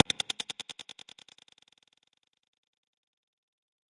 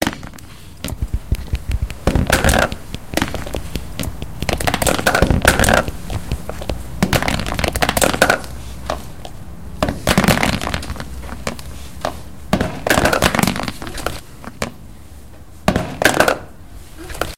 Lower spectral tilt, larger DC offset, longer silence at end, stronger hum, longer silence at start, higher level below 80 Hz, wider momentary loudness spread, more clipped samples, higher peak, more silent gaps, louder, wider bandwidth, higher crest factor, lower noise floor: second, -0.5 dB/octave vs -4 dB/octave; second, under 0.1% vs 2%; first, 3.05 s vs 0 s; neither; about the same, 0.1 s vs 0 s; second, -76 dBFS vs -28 dBFS; first, 24 LU vs 19 LU; neither; second, -4 dBFS vs 0 dBFS; neither; second, -34 LUFS vs -19 LUFS; second, 11.5 kHz vs 17 kHz; first, 34 dB vs 20 dB; first, -74 dBFS vs -39 dBFS